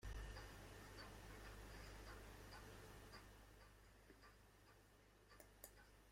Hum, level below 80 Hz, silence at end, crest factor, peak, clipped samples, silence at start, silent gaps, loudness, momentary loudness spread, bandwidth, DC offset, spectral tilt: none; -64 dBFS; 0 s; 22 dB; -38 dBFS; under 0.1%; 0 s; none; -61 LUFS; 10 LU; 16.5 kHz; under 0.1%; -4 dB/octave